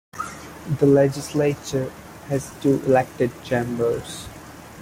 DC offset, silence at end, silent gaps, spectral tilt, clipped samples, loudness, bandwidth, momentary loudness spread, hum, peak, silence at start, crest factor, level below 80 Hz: under 0.1%; 0 s; none; -6.5 dB/octave; under 0.1%; -22 LUFS; 16.5 kHz; 18 LU; none; -4 dBFS; 0.15 s; 18 dB; -52 dBFS